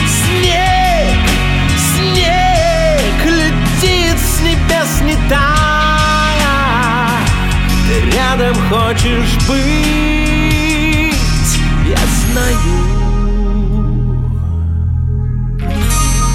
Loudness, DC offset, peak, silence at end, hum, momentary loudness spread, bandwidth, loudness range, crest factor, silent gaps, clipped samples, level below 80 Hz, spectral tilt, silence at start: -12 LUFS; under 0.1%; 0 dBFS; 0 s; none; 5 LU; 17 kHz; 3 LU; 12 dB; none; under 0.1%; -16 dBFS; -4.5 dB/octave; 0 s